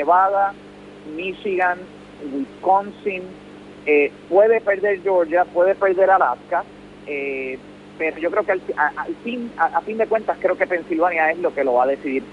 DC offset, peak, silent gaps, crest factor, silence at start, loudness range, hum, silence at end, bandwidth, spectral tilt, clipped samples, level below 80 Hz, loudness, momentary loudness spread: under 0.1%; -4 dBFS; none; 16 dB; 0 s; 6 LU; 50 Hz at -50 dBFS; 0 s; 10 kHz; -6.5 dB/octave; under 0.1%; -58 dBFS; -20 LUFS; 14 LU